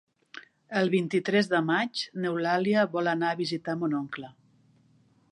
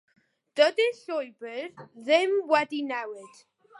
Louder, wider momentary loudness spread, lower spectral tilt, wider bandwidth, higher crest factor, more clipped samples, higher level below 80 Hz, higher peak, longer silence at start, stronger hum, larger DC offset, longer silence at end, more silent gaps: about the same, -27 LUFS vs -26 LUFS; first, 21 LU vs 17 LU; first, -6 dB/octave vs -3 dB/octave; about the same, 11 kHz vs 11.5 kHz; about the same, 18 dB vs 20 dB; neither; first, -76 dBFS vs -88 dBFS; second, -12 dBFS vs -8 dBFS; second, 0.35 s vs 0.55 s; neither; neither; first, 1 s vs 0.5 s; neither